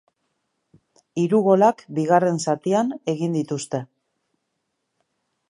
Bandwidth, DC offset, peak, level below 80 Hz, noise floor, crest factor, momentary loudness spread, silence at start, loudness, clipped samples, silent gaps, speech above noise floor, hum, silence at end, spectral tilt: 11.5 kHz; under 0.1%; -4 dBFS; -72 dBFS; -76 dBFS; 20 dB; 11 LU; 1.15 s; -21 LUFS; under 0.1%; none; 56 dB; none; 1.65 s; -6.5 dB/octave